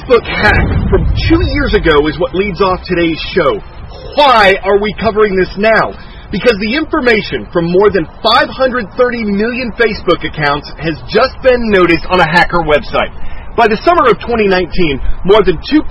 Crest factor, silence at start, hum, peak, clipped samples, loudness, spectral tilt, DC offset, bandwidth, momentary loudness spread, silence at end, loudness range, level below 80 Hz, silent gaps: 10 dB; 0 s; none; 0 dBFS; 0.4%; -11 LUFS; -7 dB/octave; under 0.1%; 10.5 kHz; 7 LU; 0 s; 2 LU; -24 dBFS; none